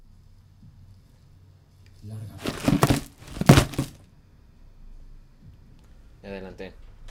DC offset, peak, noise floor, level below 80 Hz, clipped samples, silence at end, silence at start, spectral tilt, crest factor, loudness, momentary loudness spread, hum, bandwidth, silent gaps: under 0.1%; 0 dBFS; -53 dBFS; -42 dBFS; under 0.1%; 0 s; 2.05 s; -5.5 dB/octave; 28 dB; -23 LUFS; 24 LU; none; 17.5 kHz; none